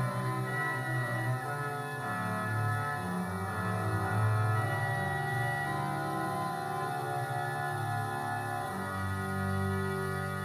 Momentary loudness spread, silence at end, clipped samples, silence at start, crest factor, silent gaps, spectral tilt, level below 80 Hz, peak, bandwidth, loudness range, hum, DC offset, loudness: 4 LU; 0 s; under 0.1%; 0 s; 14 dB; none; -6 dB/octave; -64 dBFS; -20 dBFS; 15 kHz; 2 LU; none; under 0.1%; -33 LUFS